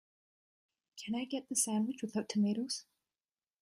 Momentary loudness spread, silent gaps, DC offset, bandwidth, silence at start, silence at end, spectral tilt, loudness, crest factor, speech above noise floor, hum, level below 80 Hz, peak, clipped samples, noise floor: 9 LU; none; under 0.1%; 14 kHz; 0.95 s; 0.8 s; -4 dB/octave; -36 LUFS; 20 dB; over 55 dB; none; -84 dBFS; -20 dBFS; under 0.1%; under -90 dBFS